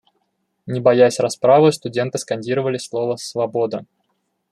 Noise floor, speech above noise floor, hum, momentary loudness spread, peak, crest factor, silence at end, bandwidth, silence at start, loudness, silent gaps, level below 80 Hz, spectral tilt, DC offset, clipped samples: -70 dBFS; 53 dB; none; 11 LU; -2 dBFS; 18 dB; 0.7 s; 12.5 kHz; 0.65 s; -18 LUFS; none; -66 dBFS; -5.5 dB/octave; under 0.1%; under 0.1%